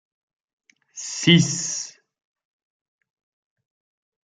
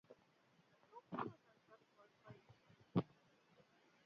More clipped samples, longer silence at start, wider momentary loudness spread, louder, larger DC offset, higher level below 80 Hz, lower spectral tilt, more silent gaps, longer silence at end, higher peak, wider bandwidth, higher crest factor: neither; first, 0.95 s vs 0.1 s; second, 20 LU vs 25 LU; first, -20 LUFS vs -47 LUFS; neither; first, -64 dBFS vs -84 dBFS; second, -3.5 dB/octave vs -7.5 dB/octave; neither; first, 2.35 s vs 1 s; first, -2 dBFS vs -26 dBFS; first, 9.4 kHz vs 6.8 kHz; about the same, 24 dB vs 26 dB